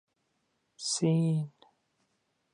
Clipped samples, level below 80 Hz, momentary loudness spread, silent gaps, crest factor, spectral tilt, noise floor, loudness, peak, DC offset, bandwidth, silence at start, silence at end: under 0.1%; -80 dBFS; 12 LU; none; 18 dB; -5.5 dB/octave; -78 dBFS; -30 LUFS; -16 dBFS; under 0.1%; 11 kHz; 0.8 s; 1.05 s